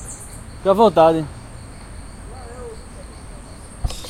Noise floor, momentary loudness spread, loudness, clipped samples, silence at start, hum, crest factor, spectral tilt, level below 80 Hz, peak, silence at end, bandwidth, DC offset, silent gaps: -37 dBFS; 24 LU; -16 LUFS; under 0.1%; 0 s; none; 20 dB; -5.5 dB/octave; -36 dBFS; 0 dBFS; 0 s; 16 kHz; under 0.1%; none